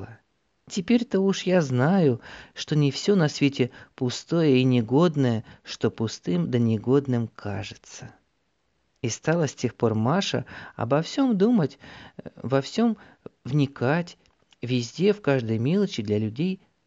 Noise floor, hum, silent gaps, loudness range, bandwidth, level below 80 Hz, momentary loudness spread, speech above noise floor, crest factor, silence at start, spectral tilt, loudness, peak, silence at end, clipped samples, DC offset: -72 dBFS; none; none; 5 LU; 8 kHz; -64 dBFS; 16 LU; 48 dB; 16 dB; 0 s; -6.5 dB/octave; -24 LUFS; -8 dBFS; 0.3 s; under 0.1%; under 0.1%